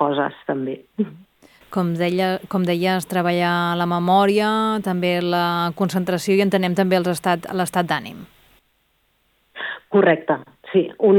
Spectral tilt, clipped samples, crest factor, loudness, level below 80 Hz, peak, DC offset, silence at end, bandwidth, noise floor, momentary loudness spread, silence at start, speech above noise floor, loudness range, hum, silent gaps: -6 dB/octave; under 0.1%; 16 dB; -20 LUFS; -62 dBFS; -4 dBFS; under 0.1%; 0 s; 18.5 kHz; -65 dBFS; 10 LU; 0 s; 46 dB; 4 LU; none; none